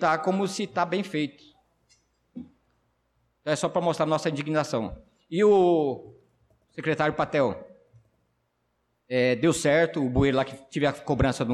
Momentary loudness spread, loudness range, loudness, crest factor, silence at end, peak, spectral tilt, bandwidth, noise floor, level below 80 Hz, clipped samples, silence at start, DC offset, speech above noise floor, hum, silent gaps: 15 LU; 6 LU; -25 LUFS; 14 dB; 0 s; -12 dBFS; -5.5 dB/octave; 13.5 kHz; -74 dBFS; -48 dBFS; under 0.1%; 0 s; under 0.1%; 49 dB; none; none